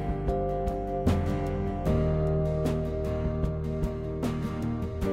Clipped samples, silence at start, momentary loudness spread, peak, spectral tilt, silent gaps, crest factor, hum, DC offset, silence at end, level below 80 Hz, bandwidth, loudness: under 0.1%; 0 s; 5 LU; -12 dBFS; -8.5 dB/octave; none; 16 dB; none; under 0.1%; 0 s; -34 dBFS; 15 kHz; -30 LUFS